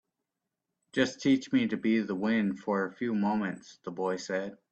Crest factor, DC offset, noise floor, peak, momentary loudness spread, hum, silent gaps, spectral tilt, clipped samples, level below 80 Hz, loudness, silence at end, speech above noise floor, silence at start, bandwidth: 18 dB; under 0.1%; -86 dBFS; -12 dBFS; 9 LU; none; none; -5.5 dB/octave; under 0.1%; -72 dBFS; -30 LUFS; 0.15 s; 57 dB; 0.95 s; 8.6 kHz